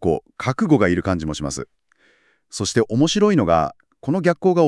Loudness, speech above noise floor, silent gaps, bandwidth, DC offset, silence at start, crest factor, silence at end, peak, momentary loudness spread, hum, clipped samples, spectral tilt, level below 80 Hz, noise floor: -19 LUFS; 41 dB; none; 12 kHz; under 0.1%; 0 s; 16 dB; 0 s; -2 dBFS; 13 LU; none; under 0.1%; -5.5 dB/octave; -48 dBFS; -59 dBFS